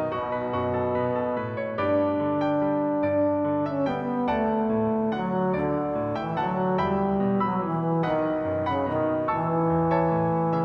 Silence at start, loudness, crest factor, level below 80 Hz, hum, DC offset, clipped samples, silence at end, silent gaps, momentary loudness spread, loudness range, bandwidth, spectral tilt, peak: 0 s; -25 LUFS; 12 dB; -54 dBFS; none; under 0.1%; under 0.1%; 0 s; none; 4 LU; 1 LU; 6 kHz; -9.5 dB/octave; -12 dBFS